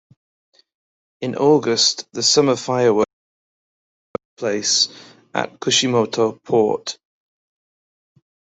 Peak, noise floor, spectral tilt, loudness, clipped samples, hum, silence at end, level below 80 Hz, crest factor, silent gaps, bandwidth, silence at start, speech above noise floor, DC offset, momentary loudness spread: -2 dBFS; under -90 dBFS; -3 dB/octave; -18 LUFS; under 0.1%; none; 1.65 s; -64 dBFS; 18 dB; 3.13-4.14 s, 4.25-4.37 s; 8.4 kHz; 1.2 s; over 72 dB; under 0.1%; 14 LU